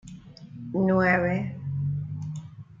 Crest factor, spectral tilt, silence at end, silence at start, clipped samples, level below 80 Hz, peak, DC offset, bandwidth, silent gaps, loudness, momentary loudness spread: 18 dB; -8.5 dB/octave; 0.05 s; 0.05 s; under 0.1%; -58 dBFS; -10 dBFS; under 0.1%; 7.6 kHz; none; -26 LUFS; 24 LU